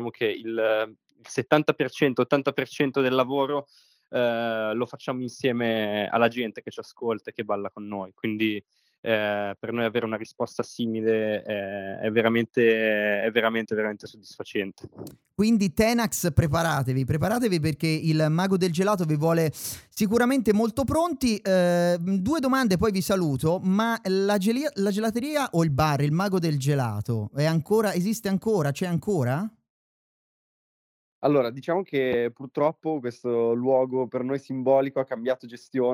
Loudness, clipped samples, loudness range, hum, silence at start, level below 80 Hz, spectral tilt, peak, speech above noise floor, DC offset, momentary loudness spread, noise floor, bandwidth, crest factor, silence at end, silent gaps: -25 LUFS; under 0.1%; 5 LU; none; 0 s; -54 dBFS; -6 dB/octave; -4 dBFS; over 65 dB; under 0.1%; 9 LU; under -90 dBFS; over 20 kHz; 20 dB; 0 s; 8.98-9.03 s, 29.70-31.22 s